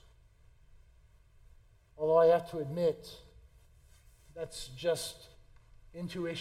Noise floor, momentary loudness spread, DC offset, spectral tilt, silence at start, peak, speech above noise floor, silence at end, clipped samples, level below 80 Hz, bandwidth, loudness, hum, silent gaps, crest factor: -62 dBFS; 27 LU; under 0.1%; -5 dB/octave; 2 s; -14 dBFS; 29 dB; 0 s; under 0.1%; -60 dBFS; 15 kHz; -32 LUFS; none; none; 20 dB